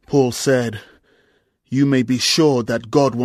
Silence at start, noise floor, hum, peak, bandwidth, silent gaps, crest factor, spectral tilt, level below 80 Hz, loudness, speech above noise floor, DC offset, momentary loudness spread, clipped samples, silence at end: 0.1 s; -62 dBFS; none; -2 dBFS; 14 kHz; none; 16 dB; -5 dB/octave; -54 dBFS; -17 LUFS; 45 dB; under 0.1%; 10 LU; under 0.1%; 0 s